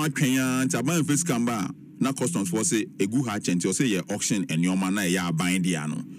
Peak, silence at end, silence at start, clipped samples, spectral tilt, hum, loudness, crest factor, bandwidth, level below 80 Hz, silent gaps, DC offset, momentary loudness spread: -8 dBFS; 0 s; 0 s; under 0.1%; -4.5 dB/octave; none; -25 LUFS; 16 dB; 16 kHz; -66 dBFS; none; under 0.1%; 4 LU